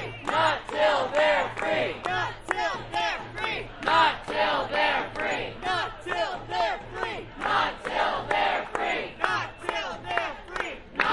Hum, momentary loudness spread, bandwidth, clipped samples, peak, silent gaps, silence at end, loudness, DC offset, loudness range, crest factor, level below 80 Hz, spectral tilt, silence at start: none; 8 LU; 11.5 kHz; under 0.1%; -8 dBFS; none; 0 s; -27 LUFS; under 0.1%; 2 LU; 20 dB; -50 dBFS; -3.5 dB/octave; 0 s